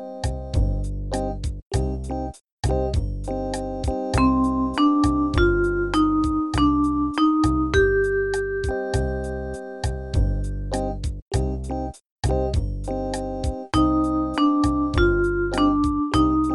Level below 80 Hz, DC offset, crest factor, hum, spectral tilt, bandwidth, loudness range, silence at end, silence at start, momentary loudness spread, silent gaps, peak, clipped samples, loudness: -28 dBFS; 0.1%; 16 dB; none; -6.5 dB/octave; 12 kHz; 7 LU; 0 s; 0 s; 10 LU; 1.66-1.70 s, 2.52-2.57 s, 11.22-11.27 s, 12.11-12.16 s; -6 dBFS; under 0.1%; -23 LUFS